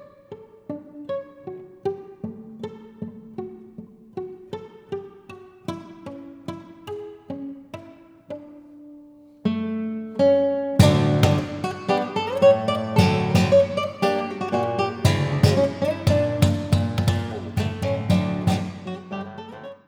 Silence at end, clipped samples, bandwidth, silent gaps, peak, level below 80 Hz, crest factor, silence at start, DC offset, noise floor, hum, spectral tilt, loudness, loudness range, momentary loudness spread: 0.1 s; under 0.1%; over 20 kHz; none; 0 dBFS; -48 dBFS; 22 dB; 0 s; under 0.1%; -47 dBFS; none; -6.5 dB/octave; -22 LUFS; 17 LU; 21 LU